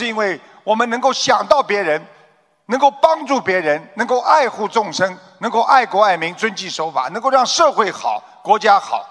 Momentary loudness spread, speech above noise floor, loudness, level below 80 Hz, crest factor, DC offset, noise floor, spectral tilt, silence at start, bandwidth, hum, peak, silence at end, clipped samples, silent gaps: 8 LU; 37 dB; -16 LUFS; -64 dBFS; 16 dB; under 0.1%; -54 dBFS; -2.5 dB/octave; 0 s; 11 kHz; none; 0 dBFS; 0.05 s; under 0.1%; none